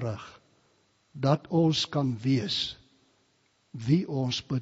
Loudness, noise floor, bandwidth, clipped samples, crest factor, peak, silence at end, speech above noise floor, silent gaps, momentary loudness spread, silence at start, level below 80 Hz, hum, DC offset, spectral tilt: -28 LUFS; -69 dBFS; 7.6 kHz; under 0.1%; 22 dB; -8 dBFS; 0 s; 42 dB; none; 16 LU; 0 s; -62 dBFS; none; under 0.1%; -5.5 dB/octave